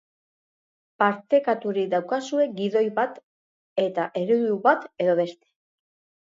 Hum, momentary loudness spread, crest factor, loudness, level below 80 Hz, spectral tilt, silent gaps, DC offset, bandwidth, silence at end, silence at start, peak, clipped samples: none; 6 LU; 20 dB; -24 LUFS; -80 dBFS; -6 dB/octave; 3.23-3.76 s; under 0.1%; 7.8 kHz; 0.9 s; 1 s; -6 dBFS; under 0.1%